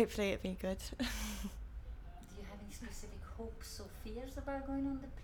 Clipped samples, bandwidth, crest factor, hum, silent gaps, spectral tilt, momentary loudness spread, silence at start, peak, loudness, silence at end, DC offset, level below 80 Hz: under 0.1%; 19 kHz; 22 dB; none; none; -5 dB/octave; 13 LU; 0 s; -20 dBFS; -43 LUFS; 0 s; under 0.1%; -48 dBFS